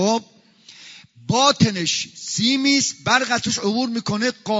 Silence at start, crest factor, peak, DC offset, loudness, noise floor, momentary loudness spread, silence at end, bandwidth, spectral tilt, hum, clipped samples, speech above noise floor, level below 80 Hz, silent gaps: 0 s; 20 dB; -2 dBFS; under 0.1%; -19 LUFS; -48 dBFS; 8 LU; 0 s; 7.8 kHz; -3.5 dB/octave; none; under 0.1%; 28 dB; -60 dBFS; none